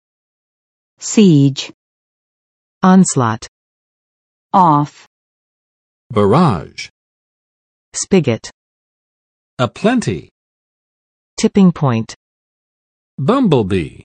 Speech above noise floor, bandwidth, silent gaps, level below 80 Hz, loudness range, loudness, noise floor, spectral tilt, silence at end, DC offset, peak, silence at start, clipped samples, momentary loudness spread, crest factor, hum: over 77 dB; 9.6 kHz; 1.74-2.81 s, 3.48-4.50 s, 5.07-6.10 s, 6.90-7.92 s, 8.54-9.57 s, 10.31-11.37 s, 12.16-13.18 s; -52 dBFS; 5 LU; -14 LUFS; under -90 dBFS; -6 dB/octave; 0.15 s; under 0.1%; 0 dBFS; 1 s; under 0.1%; 17 LU; 16 dB; none